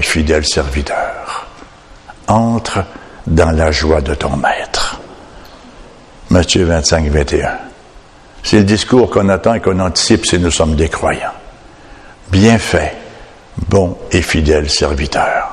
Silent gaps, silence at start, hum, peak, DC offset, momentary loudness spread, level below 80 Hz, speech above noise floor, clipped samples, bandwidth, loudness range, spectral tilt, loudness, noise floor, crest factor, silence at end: none; 0 s; none; 0 dBFS; under 0.1%; 13 LU; -24 dBFS; 27 dB; 0.1%; 13.5 kHz; 4 LU; -4.5 dB/octave; -13 LUFS; -39 dBFS; 14 dB; 0 s